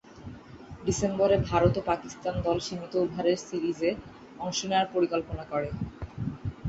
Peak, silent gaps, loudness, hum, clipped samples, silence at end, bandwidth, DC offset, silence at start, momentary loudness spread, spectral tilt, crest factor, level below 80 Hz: -8 dBFS; none; -29 LUFS; none; under 0.1%; 0 s; 8.2 kHz; under 0.1%; 0.05 s; 15 LU; -5.5 dB/octave; 20 dB; -46 dBFS